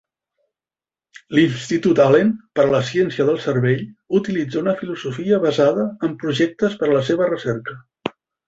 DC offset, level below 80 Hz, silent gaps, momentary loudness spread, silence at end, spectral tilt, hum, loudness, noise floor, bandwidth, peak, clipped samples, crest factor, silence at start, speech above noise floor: under 0.1%; -58 dBFS; none; 10 LU; 0.4 s; -6.5 dB/octave; none; -19 LUFS; under -90 dBFS; 8 kHz; -2 dBFS; under 0.1%; 18 dB; 1.3 s; over 72 dB